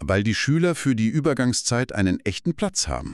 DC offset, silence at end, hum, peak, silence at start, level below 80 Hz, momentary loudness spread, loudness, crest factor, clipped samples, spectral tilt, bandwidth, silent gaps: under 0.1%; 0 s; none; -6 dBFS; 0 s; -42 dBFS; 4 LU; -22 LUFS; 16 dB; under 0.1%; -5 dB/octave; 13 kHz; none